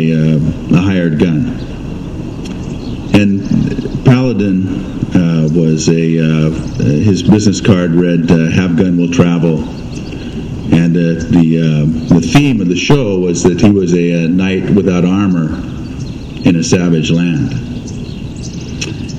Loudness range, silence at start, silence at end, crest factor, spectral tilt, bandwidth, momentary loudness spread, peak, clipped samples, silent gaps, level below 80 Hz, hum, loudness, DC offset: 4 LU; 0 s; 0 s; 12 dB; -6.5 dB/octave; 9.6 kHz; 13 LU; 0 dBFS; 0.4%; none; -30 dBFS; none; -12 LUFS; under 0.1%